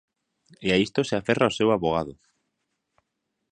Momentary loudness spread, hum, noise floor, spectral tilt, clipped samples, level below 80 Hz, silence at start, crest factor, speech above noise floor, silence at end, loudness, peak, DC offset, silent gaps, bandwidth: 8 LU; none; -80 dBFS; -5.5 dB/octave; under 0.1%; -54 dBFS; 0.6 s; 22 dB; 56 dB; 1.4 s; -24 LUFS; -4 dBFS; under 0.1%; none; 9.8 kHz